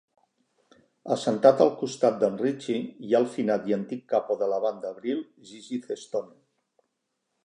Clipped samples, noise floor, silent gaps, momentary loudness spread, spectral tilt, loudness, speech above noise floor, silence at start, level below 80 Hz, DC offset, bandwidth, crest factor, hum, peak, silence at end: under 0.1%; -80 dBFS; none; 13 LU; -6 dB/octave; -26 LUFS; 54 dB; 1.05 s; -80 dBFS; under 0.1%; 10 kHz; 24 dB; none; -4 dBFS; 1.2 s